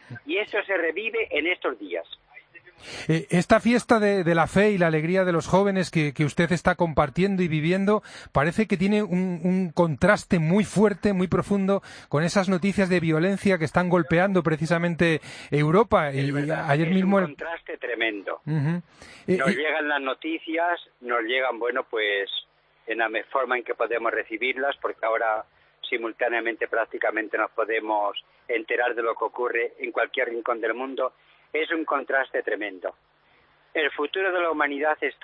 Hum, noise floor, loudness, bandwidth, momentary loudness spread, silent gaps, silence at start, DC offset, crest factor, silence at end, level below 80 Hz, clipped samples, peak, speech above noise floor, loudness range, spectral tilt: none; -61 dBFS; -24 LUFS; 10.5 kHz; 9 LU; none; 0.1 s; under 0.1%; 20 dB; 0.1 s; -54 dBFS; under 0.1%; -6 dBFS; 37 dB; 5 LU; -6.5 dB/octave